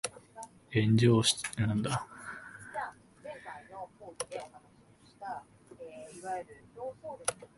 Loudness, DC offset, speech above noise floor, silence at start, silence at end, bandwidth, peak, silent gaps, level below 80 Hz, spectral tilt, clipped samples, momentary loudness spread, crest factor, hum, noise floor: -32 LUFS; under 0.1%; 30 dB; 0.05 s; 0.1 s; 12 kHz; -12 dBFS; none; -62 dBFS; -5 dB/octave; under 0.1%; 23 LU; 22 dB; none; -61 dBFS